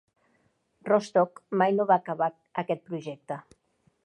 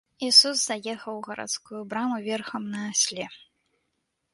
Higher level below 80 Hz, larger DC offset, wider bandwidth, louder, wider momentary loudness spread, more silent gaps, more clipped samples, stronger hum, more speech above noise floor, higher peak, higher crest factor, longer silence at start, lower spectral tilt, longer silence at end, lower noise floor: about the same, -78 dBFS vs -74 dBFS; neither; about the same, 11 kHz vs 11.5 kHz; second, -27 LUFS vs -23 LUFS; second, 15 LU vs 18 LU; neither; neither; neither; second, 44 dB vs 51 dB; second, -8 dBFS vs -4 dBFS; about the same, 20 dB vs 24 dB; first, 0.85 s vs 0.2 s; first, -6.5 dB/octave vs -1 dB/octave; second, 0.65 s vs 0.95 s; second, -70 dBFS vs -78 dBFS